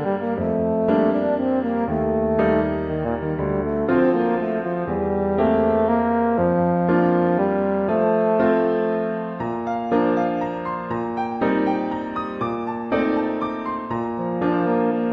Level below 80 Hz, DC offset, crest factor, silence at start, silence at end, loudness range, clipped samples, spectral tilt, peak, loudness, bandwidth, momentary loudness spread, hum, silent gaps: -44 dBFS; under 0.1%; 14 dB; 0 s; 0 s; 4 LU; under 0.1%; -9.5 dB/octave; -6 dBFS; -21 LUFS; 5.8 kHz; 8 LU; none; none